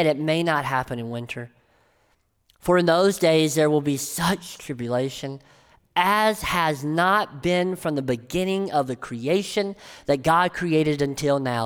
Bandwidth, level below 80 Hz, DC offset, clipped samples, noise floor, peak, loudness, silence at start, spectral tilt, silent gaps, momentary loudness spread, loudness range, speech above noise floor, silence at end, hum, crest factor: over 20 kHz; -52 dBFS; under 0.1%; under 0.1%; -66 dBFS; -4 dBFS; -23 LUFS; 0 s; -5 dB/octave; none; 12 LU; 2 LU; 44 dB; 0 s; none; 18 dB